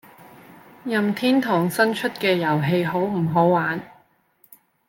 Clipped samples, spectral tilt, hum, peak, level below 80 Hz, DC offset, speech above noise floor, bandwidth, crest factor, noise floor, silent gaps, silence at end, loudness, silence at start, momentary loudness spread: under 0.1%; -6 dB/octave; none; -6 dBFS; -64 dBFS; under 0.1%; 40 dB; 17 kHz; 18 dB; -60 dBFS; none; 1 s; -21 LUFS; 0.85 s; 6 LU